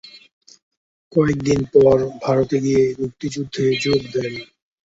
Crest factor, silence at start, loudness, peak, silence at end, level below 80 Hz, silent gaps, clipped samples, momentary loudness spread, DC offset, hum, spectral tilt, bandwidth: 18 dB; 0.05 s; -19 LUFS; -2 dBFS; 0.45 s; -48 dBFS; 0.33-0.41 s, 0.62-0.71 s, 0.77-1.11 s; under 0.1%; 12 LU; under 0.1%; none; -6 dB/octave; 8 kHz